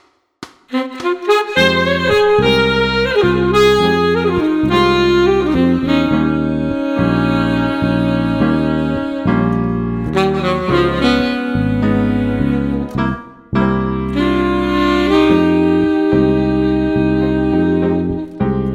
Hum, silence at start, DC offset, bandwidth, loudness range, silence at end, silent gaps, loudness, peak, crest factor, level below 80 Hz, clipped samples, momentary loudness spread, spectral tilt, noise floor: none; 0.4 s; under 0.1%; 14 kHz; 3 LU; 0 s; none; -15 LUFS; 0 dBFS; 14 dB; -32 dBFS; under 0.1%; 7 LU; -7 dB/octave; -38 dBFS